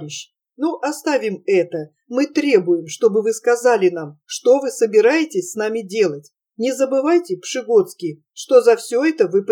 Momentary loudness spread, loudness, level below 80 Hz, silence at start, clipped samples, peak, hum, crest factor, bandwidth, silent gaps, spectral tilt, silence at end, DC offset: 11 LU; -18 LUFS; under -90 dBFS; 0 s; under 0.1%; -2 dBFS; none; 16 dB; 17 kHz; none; -4.5 dB/octave; 0 s; under 0.1%